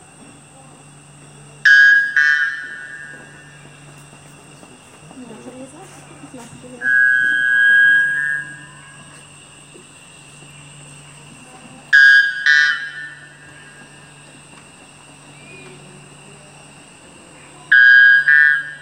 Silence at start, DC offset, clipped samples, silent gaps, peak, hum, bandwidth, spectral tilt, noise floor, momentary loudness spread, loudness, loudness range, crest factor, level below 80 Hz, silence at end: 1.65 s; under 0.1%; under 0.1%; none; 0 dBFS; none; 10 kHz; -1 dB/octave; -43 dBFS; 26 LU; -11 LUFS; 12 LU; 18 dB; -66 dBFS; 0.05 s